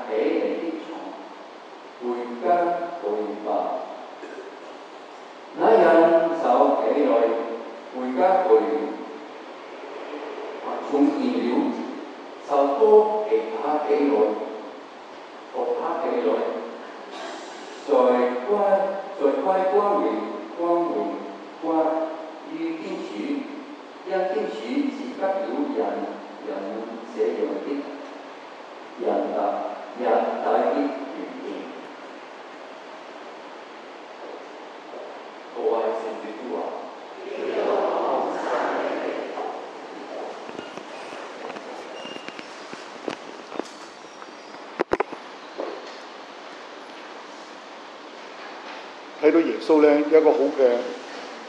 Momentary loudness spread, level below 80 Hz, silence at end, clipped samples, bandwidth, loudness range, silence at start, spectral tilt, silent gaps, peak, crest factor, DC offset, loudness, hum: 20 LU; -74 dBFS; 0 s; under 0.1%; 9 kHz; 14 LU; 0 s; -5.5 dB/octave; none; -4 dBFS; 22 dB; under 0.1%; -24 LUFS; none